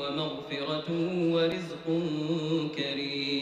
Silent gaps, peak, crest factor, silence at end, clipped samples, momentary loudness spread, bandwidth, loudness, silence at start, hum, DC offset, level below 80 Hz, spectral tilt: none; -18 dBFS; 12 dB; 0 s; under 0.1%; 6 LU; 9.4 kHz; -30 LUFS; 0 s; none; under 0.1%; -66 dBFS; -6.5 dB/octave